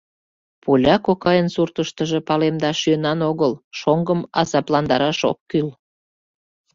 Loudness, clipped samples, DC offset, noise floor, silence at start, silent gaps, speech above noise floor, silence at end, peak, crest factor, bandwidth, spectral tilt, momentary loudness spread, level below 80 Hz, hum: -19 LUFS; under 0.1%; under 0.1%; under -90 dBFS; 0.65 s; 3.64-3.71 s, 5.41-5.46 s; over 71 dB; 1.05 s; -2 dBFS; 18 dB; 7.6 kHz; -6 dB/octave; 6 LU; -52 dBFS; none